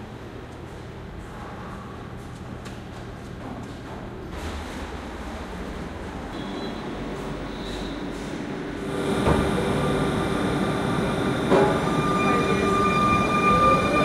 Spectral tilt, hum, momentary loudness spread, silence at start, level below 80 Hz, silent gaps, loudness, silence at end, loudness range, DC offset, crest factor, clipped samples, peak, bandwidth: -6 dB/octave; none; 18 LU; 0 s; -40 dBFS; none; -24 LUFS; 0 s; 15 LU; under 0.1%; 18 dB; under 0.1%; -6 dBFS; 15.5 kHz